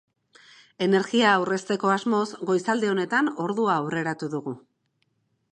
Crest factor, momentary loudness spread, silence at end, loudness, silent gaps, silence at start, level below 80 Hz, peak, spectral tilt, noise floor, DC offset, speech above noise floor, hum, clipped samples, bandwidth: 20 dB; 11 LU; 0.95 s; -24 LUFS; none; 0.8 s; -76 dBFS; -6 dBFS; -5 dB/octave; -72 dBFS; under 0.1%; 49 dB; none; under 0.1%; 10.5 kHz